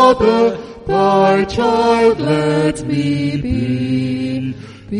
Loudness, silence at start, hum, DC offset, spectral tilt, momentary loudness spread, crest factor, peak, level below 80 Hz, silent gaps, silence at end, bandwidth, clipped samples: -15 LUFS; 0 s; none; under 0.1%; -6.5 dB/octave; 9 LU; 14 dB; 0 dBFS; -38 dBFS; none; 0 s; 10.5 kHz; under 0.1%